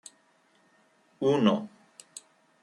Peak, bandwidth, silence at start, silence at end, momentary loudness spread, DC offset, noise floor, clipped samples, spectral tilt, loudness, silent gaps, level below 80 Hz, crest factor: -10 dBFS; 12 kHz; 1.2 s; 0.95 s; 23 LU; under 0.1%; -66 dBFS; under 0.1%; -6 dB/octave; -26 LUFS; none; -78 dBFS; 22 dB